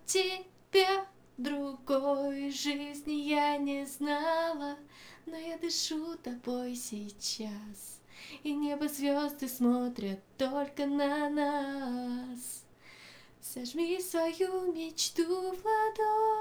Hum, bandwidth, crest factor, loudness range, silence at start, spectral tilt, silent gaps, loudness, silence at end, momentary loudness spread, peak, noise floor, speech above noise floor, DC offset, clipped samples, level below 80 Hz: none; over 20 kHz; 22 dB; 5 LU; 0 s; -2.5 dB/octave; none; -33 LUFS; 0 s; 15 LU; -12 dBFS; -55 dBFS; 22 dB; under 0.1%; under 0.1%; -70 dBFS